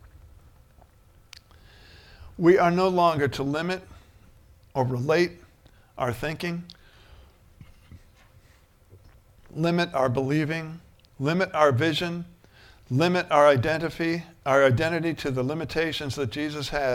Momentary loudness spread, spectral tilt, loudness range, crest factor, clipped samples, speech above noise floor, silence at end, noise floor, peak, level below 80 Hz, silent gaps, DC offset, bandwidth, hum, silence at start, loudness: 13 LU; -6 dB/octave; 12 LU; 22 dB; under 0.1%; 33 dB; 0 s; -57 dBFS; -4 dBFS; -52 dBFS; none; under 0.1%; 16.5 kHz; none; 0.05 s; -24 LUFS